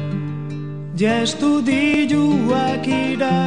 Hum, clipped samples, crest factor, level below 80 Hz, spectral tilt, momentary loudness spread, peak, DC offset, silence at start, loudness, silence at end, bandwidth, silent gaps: none; under 0.1%; 12 dB; -56 dBFS; -6 dB/octave; 11 LU; -6 dBFS; 0.7%; 0 s; -19 LUFS; 0 s; 10 kHz; none